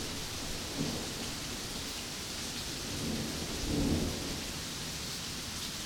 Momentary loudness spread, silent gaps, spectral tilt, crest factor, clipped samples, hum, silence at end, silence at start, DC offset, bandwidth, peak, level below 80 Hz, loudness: 5 LU; none; -3 dB/octave; 18 dB; under 0.1%; none; 0 s; 0 s; under 0.1%; 19.5 kHz; -18 dBFS; -48 dBFS; -36 LUFS